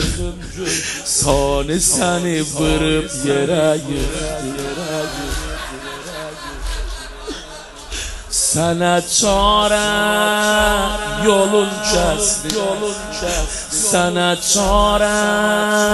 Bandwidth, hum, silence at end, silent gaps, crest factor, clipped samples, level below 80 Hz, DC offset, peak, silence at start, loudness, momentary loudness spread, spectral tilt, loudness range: 12.5 kHz; none; 0 s; none; 18 dB; under 0.1%; -30 dBFS; under 0.1%; 0 dBFS; 0 s; -17 LUFS; 14 LU; -3 dB/octave; 10 LU